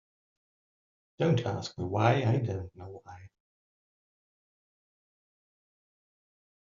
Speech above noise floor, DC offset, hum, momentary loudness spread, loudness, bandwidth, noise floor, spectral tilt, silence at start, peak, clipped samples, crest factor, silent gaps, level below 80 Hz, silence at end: over 60 dB; under 0.1%; none; 21 LU; -29 LUFS; 7.4 kHz; under -90 dBFS; -6.5 dB/octave; 1.2 s; -10 dBFS; under 0.1%; 26 dB; none; -68 dBFS; 3.45 s